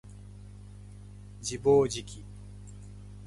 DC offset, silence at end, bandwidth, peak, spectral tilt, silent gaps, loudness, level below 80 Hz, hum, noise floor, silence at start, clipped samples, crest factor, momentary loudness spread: under 0.1%; 0 s; 11.5 kHz; -12 dBFS; -5 dB/octave; none; -28 LUFS; -50 dBFS; 50 Hz at -45 dBFS; -47 dBFS; 0.05 s; under 0.1%; 20 dB; 24 LU